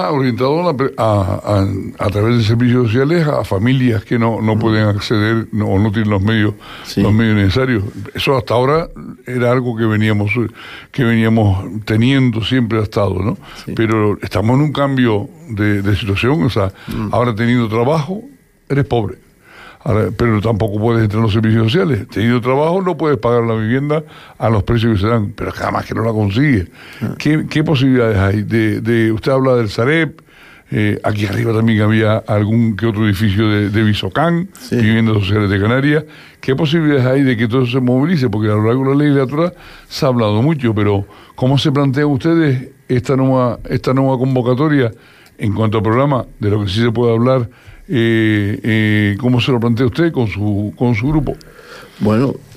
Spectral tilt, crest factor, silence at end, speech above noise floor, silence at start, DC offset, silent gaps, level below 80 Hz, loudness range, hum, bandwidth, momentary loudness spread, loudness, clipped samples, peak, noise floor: -7.5 dB/octave; 12 dB; 0 s; 26 dB; 0 s; under 0.1%; none; -40 dBFS; 2 LU; none; 14 kHz; 7 LU; -15 LUFS; under 0.1%; -4 dBFS; -40 dBFS